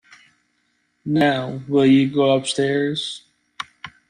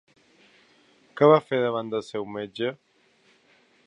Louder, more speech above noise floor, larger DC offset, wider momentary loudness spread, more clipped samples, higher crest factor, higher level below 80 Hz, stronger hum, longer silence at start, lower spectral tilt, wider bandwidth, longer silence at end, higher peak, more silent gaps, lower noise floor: first, -19 LUFS vs -24 LUFS; first, 50 dB vs 39 dB; neither; first, 19 LU vs 15 LU; neither; second, 16 dB vs 22 dB; first, -62 dBFS vs -74 dBFS; neither; about the same, 1.05 s vs 1.15 s; second, -5.5 dB/octave vs -7 dB/octave; first, 10.5 kHz vs 9.4 kHz; second, 0.2 s vs 1.15 s; about the same, -6 dBFS vs -4 dBFS; neither; first, -68 dBFS vs -62 dBFS